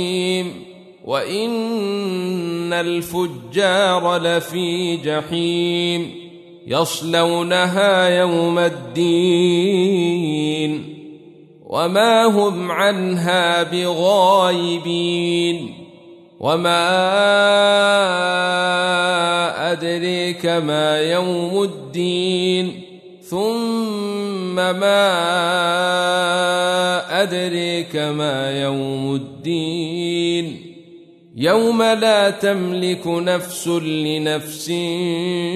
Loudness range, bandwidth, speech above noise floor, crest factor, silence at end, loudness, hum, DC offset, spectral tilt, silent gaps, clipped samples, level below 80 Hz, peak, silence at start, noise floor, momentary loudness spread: 5 LU; 13.5 kHz; 26 dB; 16 dB; 0 s; -18 LUFS; none; under 0.1%; -4.5 dB/octave; none; under 0.1%; -64 dBFS; -4 dBFS; 0 s; -44 dBFS; 9 LU